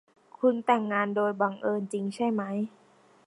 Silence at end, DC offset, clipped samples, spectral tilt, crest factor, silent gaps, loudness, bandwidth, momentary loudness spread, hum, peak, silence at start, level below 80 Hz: 0.6 s; under 0.1%; under 0.1%; -6.5 dB/octave; 18 dB; none; -28 LUFS; 11.5 kHz; 8 LU; none; -10 dBFS; 0.4 s; -78 dBFS